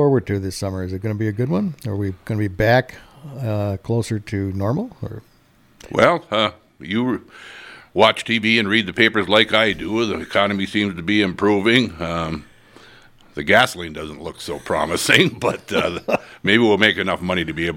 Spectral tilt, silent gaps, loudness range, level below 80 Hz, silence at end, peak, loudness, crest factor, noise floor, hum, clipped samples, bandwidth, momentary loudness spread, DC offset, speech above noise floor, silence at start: -5 dB/octave; none; 5 LU; -48 dBFS; 0 s; 0 dBFS; -19 LUFS; 20 dB; -54 dBFS; none; under 0.1%; 17 kHz; 15 LU; under 0.1%; 35 dB; 0 s